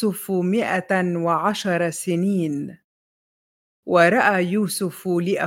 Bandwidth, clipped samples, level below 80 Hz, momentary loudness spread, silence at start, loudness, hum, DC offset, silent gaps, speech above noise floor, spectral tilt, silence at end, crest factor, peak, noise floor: 17 kHz; under 0.1%; -70 dBFS; 9 LU; 0 s; -21 LUFS; none; under 0.1%; 2.84-3.83 s; over 69 dB; -5.5 dB/octave; 0 s; 20 dB; -2 dBFS; under -90 dBFS